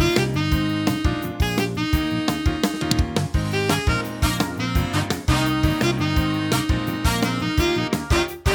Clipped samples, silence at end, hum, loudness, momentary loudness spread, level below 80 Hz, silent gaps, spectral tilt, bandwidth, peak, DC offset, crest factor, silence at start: under 0.1%; 0 s; none; -22 LUFS; 3 LU; -28 dBFS; none; -5 dB/octave; over 20 kHz; -2 dBFS; under 0.1%; 20 dB; 0 s